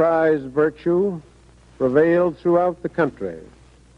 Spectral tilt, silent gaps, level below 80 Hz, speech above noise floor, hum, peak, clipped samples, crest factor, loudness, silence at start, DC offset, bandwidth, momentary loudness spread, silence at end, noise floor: -9 dB/octave; none; -52 dBFS; 30 dB; none; -4 dBFS; under 0.1%; 16 dB; -20 LUFS; 0 s; under 0.1%; 7 kHz; 15 LU; 0.55 s; -50 dBFS